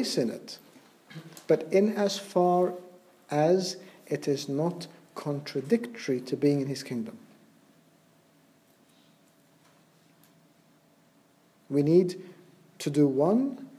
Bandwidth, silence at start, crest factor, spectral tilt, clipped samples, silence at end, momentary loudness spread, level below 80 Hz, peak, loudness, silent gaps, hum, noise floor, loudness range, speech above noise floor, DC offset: 15 kHz; 0 s; 20 dB; -6 dB/octave; under 0.1%; 0 s; 19 LU; -82 dBFS; -10 dBFS; -28 LUFS; none; none; -63 dBFS; 7 LU; 36 dB; under 0.1%